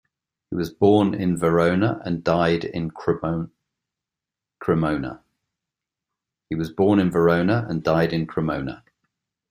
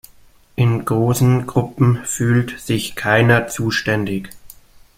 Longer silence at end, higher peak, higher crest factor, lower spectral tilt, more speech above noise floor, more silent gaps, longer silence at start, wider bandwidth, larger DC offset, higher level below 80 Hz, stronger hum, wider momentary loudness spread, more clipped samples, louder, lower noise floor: first, 0.75 s vs 0.5 s; about the same, -4 dBFS vs -2 dBFS; about the same, 18 dB vs 16 dB; first, -7.5 dB/octave vs -5.5 dB/octave; first, 67 dB vs 31 dB; neither; about the same, 0.5 s vs 0.6 s; about the same, 15 kHz vs 16 kHz; neither; second, -52 dBFS vs -46 dBFS; neither; first, 12 LU vs 7 LU; neither; second, -22 LUFS vs -17 LUFS; first, -88 dBFS vs -48 dBFS